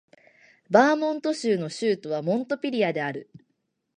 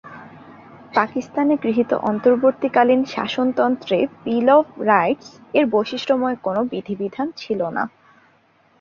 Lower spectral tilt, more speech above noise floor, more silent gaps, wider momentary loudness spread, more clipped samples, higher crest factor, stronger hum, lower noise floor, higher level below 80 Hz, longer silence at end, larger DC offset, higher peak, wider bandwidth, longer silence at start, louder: about the same, -5.5 dB/octave vs -6.5 dB/octave; first, 52 dB vs 39 dB; neither; about the same, 9 LU vs 10 LU; neither; about the same, 22 dB vs 18 dB; neither; first, -76 dBFS vs -57 dBFS; second, -78 dBFS vs -64 dBFS; second, 0.75 s vs 0.95 s; neither; about the same, -4 dBFS vs -2 dBFS; first, 10.5 kHz vs 7.2 kHz; first, 0.7 s vs 0.05 s; second, -25 LUFS vs -20 LUFS